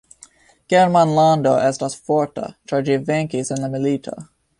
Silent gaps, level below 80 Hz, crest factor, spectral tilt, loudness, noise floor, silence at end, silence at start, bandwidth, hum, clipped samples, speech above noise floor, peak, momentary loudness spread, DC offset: none; -58 dBFS; 16 dB; -6 dB/octave; -18 LUFS; -49 dBFS; 0.35 s; 0.7 s; 11.5 kHz; none; under 0.1%; 32 dB; -2 dBFS; 12 LU; under 0.1%